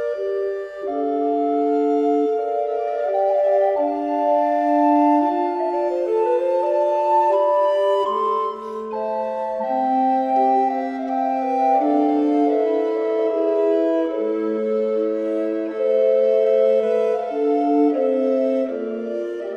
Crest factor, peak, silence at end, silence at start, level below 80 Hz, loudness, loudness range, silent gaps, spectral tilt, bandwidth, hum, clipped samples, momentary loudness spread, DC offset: 12 dB; -6 dBFS; 0 s; 0 s; -66 dBFS; -20 LUFS; 2 LU; none; -6.5 dB/octave; 7.6 kHz; none; under 0.1%; 7 LU; under 0.1%